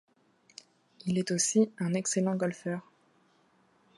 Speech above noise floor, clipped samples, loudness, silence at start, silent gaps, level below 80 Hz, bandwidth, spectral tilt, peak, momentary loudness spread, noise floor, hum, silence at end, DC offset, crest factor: 38 dB; under 0.1%; -30 LUFS; 1.05 s; none; -74 dBFS; 11.5 kHz; -4.5 dB/octave; -14 dBFS; 25 LU; -67 dBFS; none; 1.15 s; under 0.1%; 20 dB